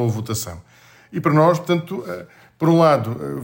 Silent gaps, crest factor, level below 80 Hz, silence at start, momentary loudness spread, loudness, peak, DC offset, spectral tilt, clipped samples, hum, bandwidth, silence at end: none; 16 dB; -54 dBFS; 0 s; 17 LU; -19 LUFS; -2 dBFS; under 0.1%; -6.5 dB/octave; under 0.1%; none; 16.5 kHz; 0 s